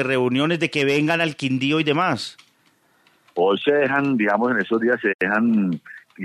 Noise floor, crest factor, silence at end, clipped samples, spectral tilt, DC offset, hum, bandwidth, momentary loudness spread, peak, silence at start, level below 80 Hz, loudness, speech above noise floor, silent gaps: -61 dBFS; 18 dB; 0 s; under 0.1%; -6 dB/octave; under 0.1%; none; 13.5 kHz; 4 LU; -4 dBFS; 0 s; -68 dBFS; -20 LUFS; 41 dB; 5.14-5.19 s